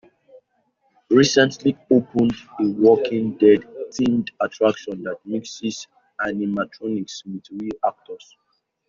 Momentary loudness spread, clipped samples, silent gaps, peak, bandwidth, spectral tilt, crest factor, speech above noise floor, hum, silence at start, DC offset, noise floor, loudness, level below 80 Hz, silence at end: 16 LU; under 0.1%; none; -2 dBFS; 7.6 kHz; -4.5 dB/octave; 18 dB; 47 dB; none; 1.1 s; under 0.1%; -67 dBFS; -21 LUFS; -60 dBFS; 0.7 s